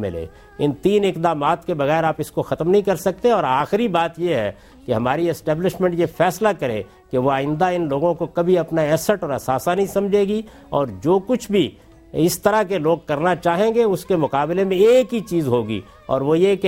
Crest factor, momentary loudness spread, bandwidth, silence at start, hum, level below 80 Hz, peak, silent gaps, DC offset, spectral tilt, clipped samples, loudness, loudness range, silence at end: 16 dB; 8 LU; 16.5 kHz; 0 s; none; -50 dBFS; -2 dBFS; none; under 0.1%; -6 dB/octave; under 0.1%; -20 LUFS; 2 LU; 0 s